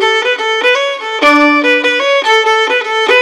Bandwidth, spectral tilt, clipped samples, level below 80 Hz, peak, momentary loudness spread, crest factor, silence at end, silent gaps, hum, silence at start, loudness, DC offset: 13.5 kHz; -0.5 dB/octave; 0.2%; -58 dBFS; 0 dBFS; 4 LU; 10 dB; 0 s; none; none; 0 s; -10 LUFS; under 0.1%